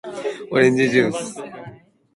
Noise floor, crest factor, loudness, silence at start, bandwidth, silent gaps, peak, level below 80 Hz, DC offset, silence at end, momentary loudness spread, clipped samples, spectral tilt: -43 dBFS; 18 dB; -19 LUFS; 0.05 s; 11.5 kHz; none; -2 dBFS; -62 dBFS; under 0.1%; 0.4 s; 19 LU; under 0.1%; -5.5 dB/octave